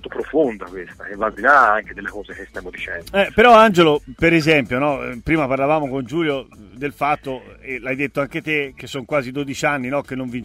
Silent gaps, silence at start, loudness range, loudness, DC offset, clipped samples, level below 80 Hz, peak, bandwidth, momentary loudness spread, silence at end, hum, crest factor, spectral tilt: none; 0.05 s; 8 LU; -18 LUFS; under 0.1%; under 0.1%; -44 dBFS; -2 dBFS; 16 kHz; 18 LU; 0 s; none; 18 dB; -5.5 dB/octave